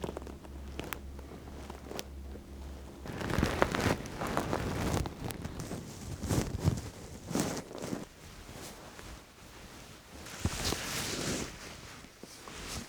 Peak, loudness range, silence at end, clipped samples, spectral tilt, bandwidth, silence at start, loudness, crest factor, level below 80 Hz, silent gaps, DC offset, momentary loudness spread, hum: -6 dBFS; 7 LU; 0 s; under 0.1%; -4.5 dB/octave; over 20 kHz; 0 s; -37 LUFS; 32 dB; -48 dBFS; none; under 0.1%; 16 LU; none